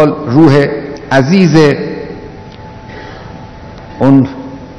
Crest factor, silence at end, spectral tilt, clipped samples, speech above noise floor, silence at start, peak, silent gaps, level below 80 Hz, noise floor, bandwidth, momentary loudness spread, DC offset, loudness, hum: 12 dB; 0 s; -7.5 dB/octave; 2%; 22 dB; 0 s; 0 dBFS; none; -38 dBFS; -29 dBFS; 11 kHz; 23 LU; under 0.1%; -9 LUFS; none